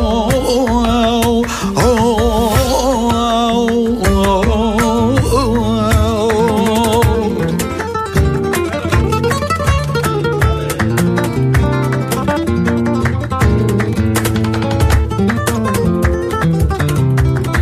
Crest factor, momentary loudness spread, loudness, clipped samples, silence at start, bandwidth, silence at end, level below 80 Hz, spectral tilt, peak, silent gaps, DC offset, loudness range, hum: 12 dB; 3 LU; -14 LUFS; under 0.1%; 0 s; 15.5 kHz; 0 s; -24 dBFS; -6 dB/octave; 0 dBFS; none; under 0.1%; 2 LU; none